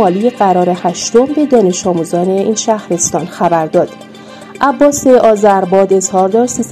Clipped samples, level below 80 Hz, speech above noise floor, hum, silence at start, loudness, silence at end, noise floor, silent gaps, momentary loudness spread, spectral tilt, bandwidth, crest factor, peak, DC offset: 0.4%; -50 dBFS; 21 dB; none; 0 s; -11 LUFS; 0 s; -31 dBFS; none; 7 LU; -5 dB/octave; 13.5 kHz; 10 dB; 0 dBFS; under 0.1%